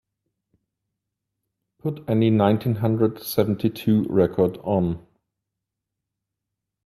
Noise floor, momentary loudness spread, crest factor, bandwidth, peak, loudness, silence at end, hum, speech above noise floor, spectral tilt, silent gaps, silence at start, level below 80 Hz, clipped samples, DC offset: -84 dBFS; 10 LU; 20 dB; 13.5 kHz; -4 dBFS; -22 LUFS; 1.9 s; none; 63 dB; -8 dB/octave; none; 1.85 s; -56 dBFS; under 0.1%; under 0.1%